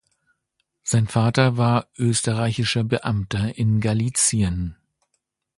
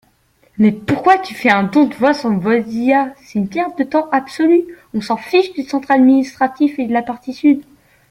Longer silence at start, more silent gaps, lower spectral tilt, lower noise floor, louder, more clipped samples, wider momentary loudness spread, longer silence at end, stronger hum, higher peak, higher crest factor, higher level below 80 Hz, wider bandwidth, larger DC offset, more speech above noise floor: first, 0.85 s vs 0.6 s; neither; second, -5 dB/octave vs -6.5 dB/octave; first, -75 dBFS vs -56 dBFS; second, -21 LUFS vs -15 LUFS; neither; about the same, 6 LU vs 8 LU; first, 0.85 s vs 0.5 s; neither; about the same, -2 dBFS vs 0 dBFS; about the same, 20 dB vs 16 dB; first, -42 dBFS vs -54 dBFS; second, 11.5 kHz vs 13 kHz; neither; first, 55 dB vs 41 dB